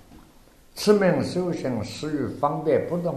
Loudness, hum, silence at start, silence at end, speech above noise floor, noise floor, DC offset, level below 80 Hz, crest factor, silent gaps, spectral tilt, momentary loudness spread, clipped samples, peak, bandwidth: -24 LUFS; none; 0.1 s; 0 s; 29 dB; -53 dBFS; under 0.1%; -54 dBFS; 20 dB; none; -6 dB/octave; 10 LU; under 0.1%; -4 dBFS; 13.5 kHz